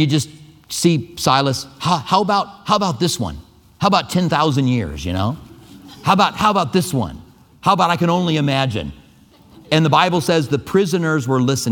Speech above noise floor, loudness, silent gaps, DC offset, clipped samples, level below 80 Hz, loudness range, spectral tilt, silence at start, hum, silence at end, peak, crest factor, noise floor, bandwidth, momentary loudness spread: 31 dB; -18 LUFS; none; under 0.1%; under 0.1%; -44 dBFS; 2 LU; -5 dB/octave; 0 s; none; 0 s; 0 dBFS; 18 dB; -48 dBFS; 18.5 kHz; 9 LU